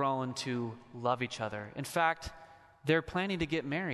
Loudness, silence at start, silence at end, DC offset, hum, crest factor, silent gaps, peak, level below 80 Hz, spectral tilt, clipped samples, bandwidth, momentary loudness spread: -34 LUFS; 0 s; 0 s; under 0.1%; none; 20 dB; none; -14 dBFS; -58 dBFS; -5 dB/octave; under 0.1%; 12.5 kHz; 9 LU